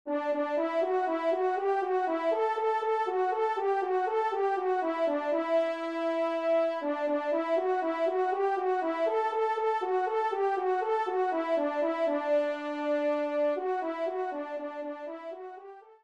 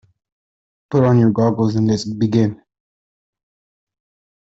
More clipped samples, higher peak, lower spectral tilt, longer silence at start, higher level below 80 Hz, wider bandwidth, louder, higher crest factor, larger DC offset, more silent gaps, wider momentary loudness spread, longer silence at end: neither; second, -18 dBFS vs -2 dBFS; second, -3.5 dB/octave vs -8 dB/octave; second, 0.05 s vs 0.9 s; second, -82 dBFS vs -54 dBFS; about the same, 8.8 kHz vs 8 kHz; second, -29 LUFS vs -17 LUFS; about the same, 12 dB vs 16 dB; neither; neither; about the same, 5 LU vs 6 LU; second, 0.15 s vs 1.85 s